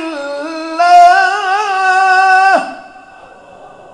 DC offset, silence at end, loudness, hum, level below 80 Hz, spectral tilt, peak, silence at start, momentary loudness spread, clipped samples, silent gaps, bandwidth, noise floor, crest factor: under 0.1%; 0.25 s; -10 LUFS; none; -58 dBFS; -1.5 dB/octave; 0 dBFS; 0 s; 15 LU; 0.9%; none; 11 kHz; -37 dBFS; 12 dB